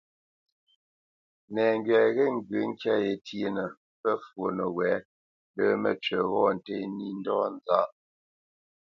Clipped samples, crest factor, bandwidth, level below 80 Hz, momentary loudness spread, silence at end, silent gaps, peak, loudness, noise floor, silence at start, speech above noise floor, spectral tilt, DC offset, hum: under 0.1%; 20 dB; 6.8 kHz; -72 dBFS; 11 LU; 0.95 s; 3.77-4.04 s, 5.05-5.54 s; -8 dBFS; -28 LUFS; under -90 dBFS; 1.5 s; over 63 dB; -7 dB/octave; under 0.1%; none